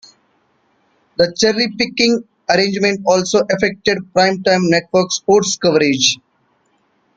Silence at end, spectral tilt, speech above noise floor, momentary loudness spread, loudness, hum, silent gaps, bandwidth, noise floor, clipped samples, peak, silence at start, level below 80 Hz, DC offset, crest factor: 1 s; -3.5 dB/octave; 46 dB; 4 LU; -15 LUFS; none; none; 9.4 kHz; -61 dBFS; under 0.1%; 0 dBFS; 1.2 s; -54 dBFS; under 0.1%; 16 dB